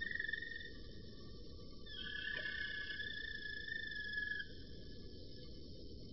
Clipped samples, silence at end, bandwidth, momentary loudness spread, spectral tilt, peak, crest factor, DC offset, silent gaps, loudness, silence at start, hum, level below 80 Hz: under 0.1%; 0 s; 6 kHz; 13 LU; -1.5 dB/octave; -28 dBFS; 18 dB; 0.2%; none; -46 LUFS; 0 s; none; -58 dBFS